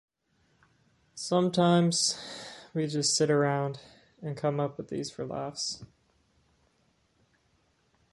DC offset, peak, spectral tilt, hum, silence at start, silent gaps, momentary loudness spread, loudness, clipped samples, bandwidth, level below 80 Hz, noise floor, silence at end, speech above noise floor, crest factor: under 0.1%; -12 dBFS; -4.5 dB/octave; none; 1.15 s; none; 18 LU; -29 LUFS; under 0.1%; 11.5 kHz; -70 dBFS; -71 dBFS; 2.25 s; 42 dB; 18 dB